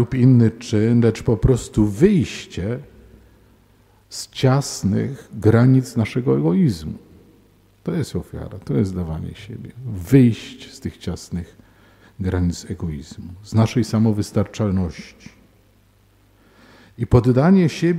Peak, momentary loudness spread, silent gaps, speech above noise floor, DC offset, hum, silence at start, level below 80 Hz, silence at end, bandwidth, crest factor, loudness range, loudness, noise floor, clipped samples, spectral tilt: 0 dBFS; 18 LU; none; 37 dB; under 0.1%; none; 0 s; -40 dBFS; 0 s; 14.5 kHz; 20 dB; 6 LU; -19 LUFS; -55 dBFS; under 0.1%; -7.5 dB/octave